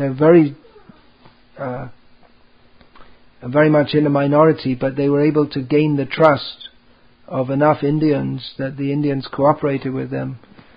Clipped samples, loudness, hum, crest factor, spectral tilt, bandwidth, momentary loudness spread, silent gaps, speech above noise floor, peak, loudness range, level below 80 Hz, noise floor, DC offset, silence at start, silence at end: under 0.1%; -17 LUFS; none; 18 dB; -10 dB/octave; 5.2 kHz; 16 LU; none; 36 dB; 0 dBFS; 5 LU; -54 dBFS; -52 dBFS; 0.2%; 0 s; 0.4 s